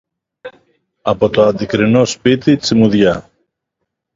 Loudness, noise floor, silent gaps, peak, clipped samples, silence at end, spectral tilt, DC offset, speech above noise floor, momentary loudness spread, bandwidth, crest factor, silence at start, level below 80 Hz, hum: -13 LUFS; -75 dBFS; none; 0 dBFS; under 0.1%; 0.95 s; -6 dB/octave; under 0.1%; 63 dB; 6 LU; 7.8 kHz; 14 dB; 0.45 s; -46 dBFS; none